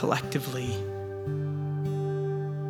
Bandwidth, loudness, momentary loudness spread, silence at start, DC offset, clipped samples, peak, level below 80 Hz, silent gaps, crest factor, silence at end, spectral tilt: 16 kHz; -31 LUFS; 5 LU; 0 s; under 0.1%; under 0.1%; -10 dBFS; -60 dBFS; none; 20 dB; 0 s; -6.5 dB/octave